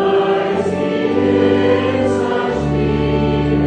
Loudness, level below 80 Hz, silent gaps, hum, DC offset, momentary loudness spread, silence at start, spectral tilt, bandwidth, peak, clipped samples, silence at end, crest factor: -16 LUFS; -32 dBFS; none; none; under 0.1%; 4 LU; 0 s; -7.5 dB/octave; 9.4 kHz; -2 dBFS; under 0.1%; 0 s; 14 dB